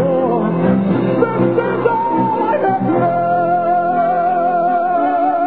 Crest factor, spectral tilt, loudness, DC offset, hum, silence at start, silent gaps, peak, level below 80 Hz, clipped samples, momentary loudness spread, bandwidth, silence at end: 14 dB; -12 dB/octave; -15 LUFS; 0.7%; none; 0 s; none; -2 dBFS; -54 dBFS; under 0.1%; 1 LU; 4.7 kHz; 0 s